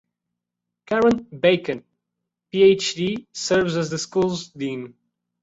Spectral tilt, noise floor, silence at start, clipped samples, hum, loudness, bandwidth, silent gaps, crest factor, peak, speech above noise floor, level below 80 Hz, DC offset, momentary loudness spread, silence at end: -4.5 dB/octave; -83 dBFS; 0.9 s; under 0.1%; none; -21 LUFS; 8 kHz; none; 18 dB; -4 dBFS; 63 dB; -58 dBFS; under 0.1%; 13 LU; 0.55 s